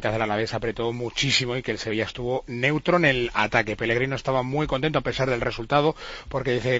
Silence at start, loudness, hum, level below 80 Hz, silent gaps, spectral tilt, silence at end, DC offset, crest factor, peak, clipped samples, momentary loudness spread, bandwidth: 0 s; -24 LUFS; none; -44 dBFS; none; -5 dB/octave; 0 s; under 0.1%; 20 dB; -4 dBFS; under 0.1%; 7 LU; 8 kHz